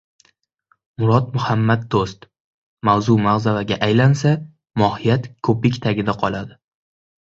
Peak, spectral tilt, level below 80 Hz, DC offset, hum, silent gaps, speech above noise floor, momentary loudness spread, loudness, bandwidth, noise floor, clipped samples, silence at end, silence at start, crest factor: -2 dBFS; -7 dB/octave; -48 dBFS; under 0.1%; none; 2.40-2.77 s; 47 dB; 8 LU; -19 LUFS; 7.8 kHz; -64 dBFS; under 0.1%; 0.75 s; 1 s; 16 dB